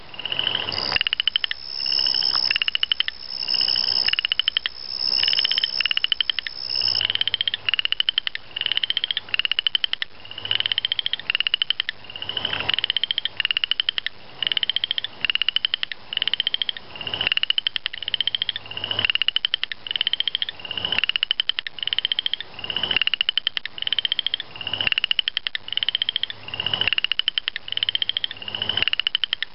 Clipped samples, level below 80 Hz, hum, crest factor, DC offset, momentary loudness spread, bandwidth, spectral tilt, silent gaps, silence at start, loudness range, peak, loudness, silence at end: under 0.1%; -56 dBFS; none; 20 dB; 0.9%; 8 LU; 8.4 kHz; -2.5 dB/octave; none; 0 s; 3 LU; -4 dBFS; -21 LUFS; 0.1 s